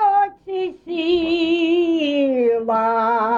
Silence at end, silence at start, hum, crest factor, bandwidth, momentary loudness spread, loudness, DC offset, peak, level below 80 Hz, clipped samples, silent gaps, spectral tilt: 0 s; 0 s; none; 10 dB; 7.2 kHz; 8 LU; -19 LUFS; under 0.1%; -8 dBFS; -56 dBFS; under 0.1%; none; -5.5 dB/octave